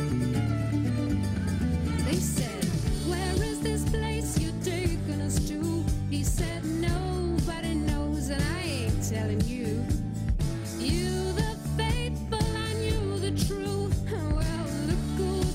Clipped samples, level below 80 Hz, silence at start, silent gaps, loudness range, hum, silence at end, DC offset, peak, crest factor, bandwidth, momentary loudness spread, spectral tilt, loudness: under 0.1%; -34 dBFS; 0 s; none; 1 LU; none; 0 s; under 0.1%; -14 dBFS; 12 dB; 16 kHz; 2 LU; -5.5 dB/octave; -29 LUFS